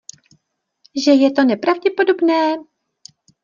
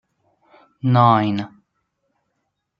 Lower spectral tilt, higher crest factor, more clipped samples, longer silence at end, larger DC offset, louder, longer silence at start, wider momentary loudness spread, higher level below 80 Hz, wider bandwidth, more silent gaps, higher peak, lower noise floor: second, -4 dB/octave vs -9 dB/octave; about the same, 16 dB vs 20 dB; neither; second, 0.8 s vs 1.35 s; neither; about the same, -16 LUFS vs -17 LUFS; about the same, 0.95 s vs 0.85 s; second, 8 LU vs 14 LU; second, -70 dBFS vs -64 dBFS; first, 7.4 kHz vs 5.6 kHz; neither; about the same, -2 dBFS vs -2 dBFS; second, -66 dBFS vs -75 dBFS